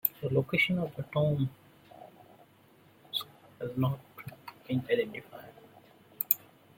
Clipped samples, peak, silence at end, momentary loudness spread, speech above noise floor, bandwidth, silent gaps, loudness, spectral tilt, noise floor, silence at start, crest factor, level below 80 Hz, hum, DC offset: under 0.1%; -4 dBFS; 0.4 s; 22 LU; 30 dB; 16.5 kHz; none; -31 LUFS; -6 dB/octave; -61 dBFS; 0.05 s; 30 dB; -68 dBFS; none; under 0.1%